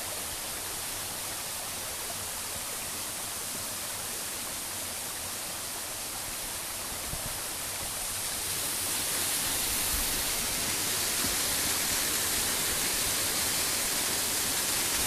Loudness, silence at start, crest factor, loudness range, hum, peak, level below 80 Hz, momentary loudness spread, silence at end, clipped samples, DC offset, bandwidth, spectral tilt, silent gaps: -29 LUFS; 0 s; 18 dB; 7 LU; none; -14 dBFS; -50 dBFS; 7 LU; 0 s; under 0.1%; under 0.1%; 15.5 kHz; -0.5 dB/octave; none